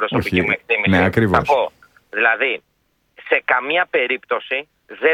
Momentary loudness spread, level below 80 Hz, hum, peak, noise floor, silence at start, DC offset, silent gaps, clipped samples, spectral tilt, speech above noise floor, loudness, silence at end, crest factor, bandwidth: 9 LU; -46 dBFS; none; 0 dBFS; -56 dBFS; 0 s; under 0.1%; none; under 0.1%; -6.5 dB/octave; 38 dB; -18 LUFS; 0 s; 18 dB; 16 kHz